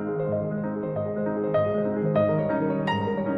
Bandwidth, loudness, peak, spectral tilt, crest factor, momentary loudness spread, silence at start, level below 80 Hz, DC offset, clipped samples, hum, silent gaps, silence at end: 6.2 kHz; -26 LUFS; -10 dBFS; -9.5 dB/octave; 14 dB; 6 LU; 0 s; -60 dBFS; under 0.1%; under 0.1%; none; none; 0 s